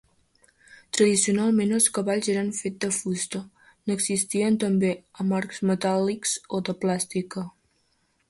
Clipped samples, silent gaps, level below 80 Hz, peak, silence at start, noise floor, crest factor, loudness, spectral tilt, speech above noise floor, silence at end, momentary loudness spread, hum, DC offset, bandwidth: under 0.1%; none; -66 dBFS; -8 dBFS; 0.95 s; -69 dBFS; 18 dB; -25 LUFS; -4 dB/octave; 45 dB; 0.8 s; 10 LU; none; under 0.1%; 12 kHz